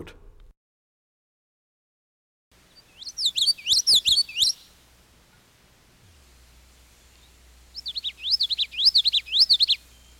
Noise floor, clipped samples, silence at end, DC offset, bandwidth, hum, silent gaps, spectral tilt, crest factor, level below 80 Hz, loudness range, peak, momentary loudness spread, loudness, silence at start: -58 dBFS; under 0.1%; 0.45 s; under 0.1%; 17 kHz; none; 0.57-2.51 s; 2 dB/octave; 18 dB; -56 dBFS; 12 LU; -8 dBFS; 18 LU; -19 LUFS; 0 s